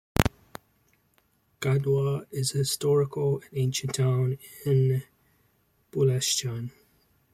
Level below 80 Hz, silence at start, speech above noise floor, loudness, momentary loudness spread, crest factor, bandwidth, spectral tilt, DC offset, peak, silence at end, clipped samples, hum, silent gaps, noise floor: -48 dBFS; 0.2 s; 42 dB; -27 LUFS; 12 LU; 26 dB; 16.5 kHz; -5 dB/octave; under 0.1%; -2 dBFS; 0.65 s; under 0.1%; none; none; -68 dBFS